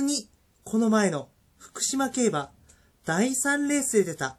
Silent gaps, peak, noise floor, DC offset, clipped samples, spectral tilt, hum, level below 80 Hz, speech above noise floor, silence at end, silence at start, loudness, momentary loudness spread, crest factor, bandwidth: none; -10 dBFS; -58 dBFS; under 0.1%; under 0.1%; -3.5 dB/octave; none; -64 dBFS; 33 dB; 0.05 s; 0 s; -25 LUFS; 11 LU; 16 dB; 15 kHz